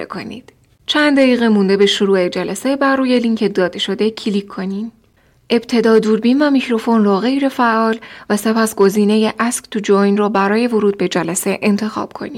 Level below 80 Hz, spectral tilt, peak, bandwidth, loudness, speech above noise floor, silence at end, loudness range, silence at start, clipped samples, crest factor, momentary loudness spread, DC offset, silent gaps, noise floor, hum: -58 dBFS; -5 dB/octave; -2 dBFS; 16 kHz; -15 LUFS; 39 dB; 0 s; 3 LU; 0 s; under 0.1%; 12 dB; 10 LU; under 0.1%; none; -54 dBFS; none